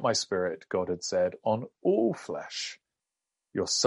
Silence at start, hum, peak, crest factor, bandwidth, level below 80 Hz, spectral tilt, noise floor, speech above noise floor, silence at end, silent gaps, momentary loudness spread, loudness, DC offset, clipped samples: 0 s; none; -10 dBFS; 20 dB; 11.5 kHz; -72 dBFS; -3.5 dB/octave; -88 dBFS; 59 dB; 0 s; none; 10 LU; -30 LUFS; under 0.1%; under 0.1%